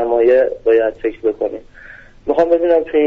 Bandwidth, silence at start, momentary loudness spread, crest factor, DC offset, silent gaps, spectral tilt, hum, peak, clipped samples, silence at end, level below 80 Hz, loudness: 5.4 kHz; 0 s; 11 LU; 12 dB; under 0.1%; none; -4 dB/octave; none; -4 dBFS; under 0.1%; 0 s; -44 dBFS; -15 LUFS